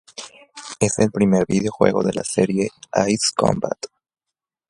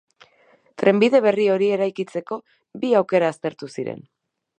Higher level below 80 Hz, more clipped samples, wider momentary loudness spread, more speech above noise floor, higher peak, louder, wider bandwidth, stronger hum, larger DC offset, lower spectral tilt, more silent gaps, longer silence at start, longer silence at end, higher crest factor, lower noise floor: first, -50 dBFS vs -74 dBFS; neither; first, 18 LU vs 15 LU; first, 66 dB vs 37 dB; about the same, 0 dBFS vs -2 dBFS; about the same, -20 LUFS vs -20 LUFS; first, 11.5 kHz vs 9.8 kHz; neither; neither; second, -5 dB/octave vs -6.5 dB/octave; neither; second, 0.2 s vs 0.8 s; first, 0.85 s vs 0.6 s; about the same, 20 dB vs 20 dB; first, -85 dBFS vs -58 dBFS